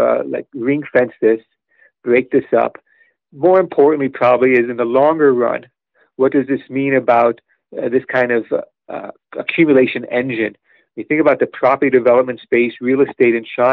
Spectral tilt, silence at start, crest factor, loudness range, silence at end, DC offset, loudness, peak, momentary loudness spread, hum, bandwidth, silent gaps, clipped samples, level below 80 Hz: -5 dB/octave; 0 s; 14 dB; 3 LU; 0 s; under 0.1%; -15 LUFS; -2 dBFS; 12 LU; none; 4.8 kHz; none; under 0.1%; -64 dBFS